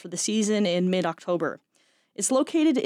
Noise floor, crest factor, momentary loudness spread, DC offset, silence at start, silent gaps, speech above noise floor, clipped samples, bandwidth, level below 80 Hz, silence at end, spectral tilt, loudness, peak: -64 dBFS; 14 dB; 9 LU; under 0.1%; 0.05 s; none; 40 dB; under 0.1%; 15.5 kHz; -78 dBFS; 0 s; -4.5 dB/octave; -25 LUFS; -12 dBFS